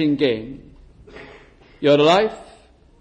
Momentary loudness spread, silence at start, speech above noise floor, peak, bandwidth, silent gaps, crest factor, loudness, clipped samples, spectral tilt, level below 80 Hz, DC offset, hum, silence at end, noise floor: 27 LU; 0 s; 33 dB; -4 dBFS; 9.8 kHz; none; 16 dB; -18 LUFS; under 0.1%; -6 dB/octave; -52 dBFS; under 0.1%; none; 0.55 s; -50 dBFS